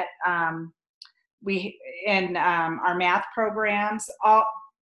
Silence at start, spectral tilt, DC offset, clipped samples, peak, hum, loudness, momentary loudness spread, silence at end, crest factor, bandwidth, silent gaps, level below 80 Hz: 0 s; -4.5 dB/octave; under 0.1%; under 0.1%; -8 dBFS; none; -24 LUFS; 11 LU; 0.15 s; 18 dB; 12 kHz; 0.89-1.01 s, 1.33-1.38 s; -70 dBFS